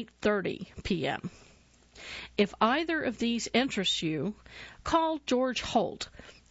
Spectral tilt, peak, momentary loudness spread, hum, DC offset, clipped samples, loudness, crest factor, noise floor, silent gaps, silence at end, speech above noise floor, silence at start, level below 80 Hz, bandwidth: -4 dB/octave; -12 dBFS; 14 LU; none; under 0.1%; under 0.1%; -30 LUFS; 20 dB; -60 dBFS; none; 0.2 s; 29 dB; 0 s; -56 dBFS; 8 kHz